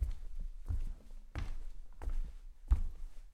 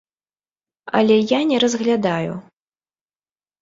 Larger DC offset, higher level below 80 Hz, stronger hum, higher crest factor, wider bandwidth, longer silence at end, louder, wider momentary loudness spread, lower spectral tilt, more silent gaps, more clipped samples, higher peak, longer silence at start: neither; first, -38 dBFS vs -64 dBFS; neither; about the same, 20 dB vs 18 dB; second, 6.4 kHz vs 7.8 kHz; second, 0 s vs 1.2 s; second, -44 LUFS vs -18 LUFS; first, 18 LU vs 10 LU; first, -7 dB/octave vs -5 dB/octave; neither; neither; second, -18 dBFS vs -2 dBFS; second, 0 s vs 0.85 s